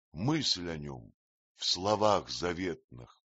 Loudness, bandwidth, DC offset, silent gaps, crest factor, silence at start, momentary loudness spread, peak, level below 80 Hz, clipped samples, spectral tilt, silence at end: -31 LUFS; 8 kHz; under 0.1%; 1.14-1.55 s, 2.84-2.88 s; 22 dB; 0.15 s; 16 LU; -12 dBFS; -60 dBFS; under 0.1%; -3.5 dB/octave; 0.25 s